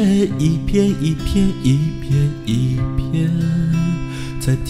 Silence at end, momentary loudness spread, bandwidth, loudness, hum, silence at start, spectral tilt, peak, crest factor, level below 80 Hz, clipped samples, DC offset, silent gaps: 0 s; 4 LU; 14.5 kHz; -18 LUFS; none; 0 s; -7.5 dB/octave; -4 dBFS; 14 dB; -30 dBFS; under 0.1%; 0.5%; none